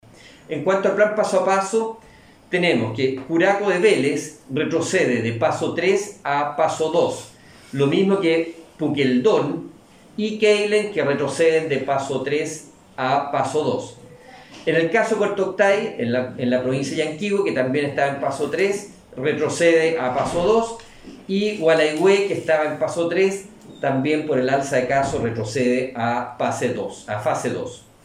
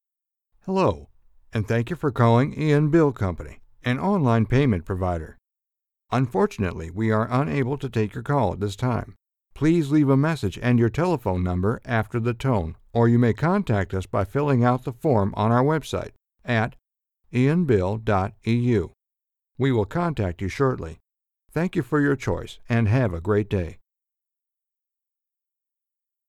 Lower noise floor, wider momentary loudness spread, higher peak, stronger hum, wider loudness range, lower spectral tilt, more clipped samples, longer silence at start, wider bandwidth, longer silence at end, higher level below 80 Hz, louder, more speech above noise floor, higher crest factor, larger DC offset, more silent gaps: second, -44 dBFS vs -87 dBFS; about the same, 10 LU vs 10 LU; about the same, -4 dBFS vs -4 dBFS; neither; about the same, 2 LU vs 4 LU; second, -5 dB/octave vs -8 dB/octave; neither; second, 0.25 s vs 0.65 s; about the same, 13 kHz vs 12.5 kHz; second, 0.25 s vs 2.55 s; second, -56 dBFS vs -46 dBFS; about the same, -21 LUFS vs -23 LUFS; second, 24 dB vs 65 dB; about the same, 16 dB vs 18 dB; neither; neither